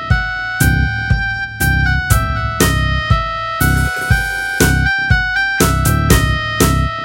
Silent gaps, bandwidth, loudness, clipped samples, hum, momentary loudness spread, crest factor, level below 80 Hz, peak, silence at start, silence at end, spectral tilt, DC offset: none; 17 kHz; -15 LUFS; under 0.1%; none; 4 LU; 14 dB; -22 dBFS; 0 dBFS; 0 s; 0 s; -4.5 dB/octave; under 0.1%